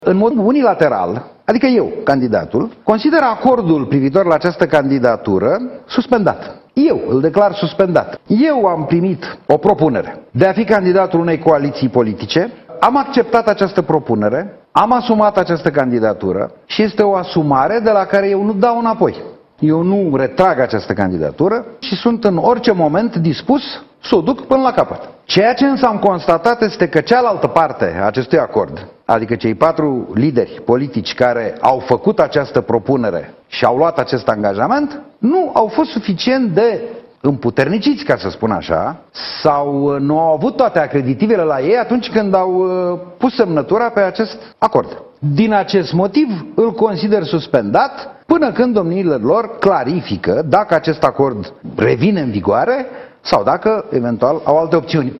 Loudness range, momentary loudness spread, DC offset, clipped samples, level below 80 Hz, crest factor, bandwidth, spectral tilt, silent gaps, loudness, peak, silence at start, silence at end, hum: 2 LU; 6 LU; under 0.1%; under 0.1%; -50 dBFS; 14 dB; 8 kHz; -7.5 dB/octave; none; -14 LUFS; 0 dBFS; 0 s; 0 s; none